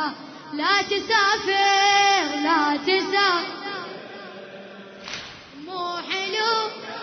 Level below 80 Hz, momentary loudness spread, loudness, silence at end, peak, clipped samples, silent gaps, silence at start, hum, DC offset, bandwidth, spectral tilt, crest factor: -66 dBFS; 21 LU; -21 LUFS; 0 s; -6 dBFS; under 0.1%; none; 0 s; none; under 0.1%; 6.6 kHz; -1.5 dB/octave; 18 dB